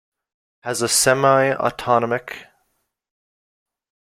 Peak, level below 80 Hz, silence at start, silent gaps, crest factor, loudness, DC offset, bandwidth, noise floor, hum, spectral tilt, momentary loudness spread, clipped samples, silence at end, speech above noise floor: -2 dBFS; -58 dBFS; 0.65 s; none; 20 dB; -18 LUFS; under 0.1%; 16.5 kHz; -71 dBFS; none; -3 dB/octave; 19 LU; under 0.1%; 1.65 s; 53 dB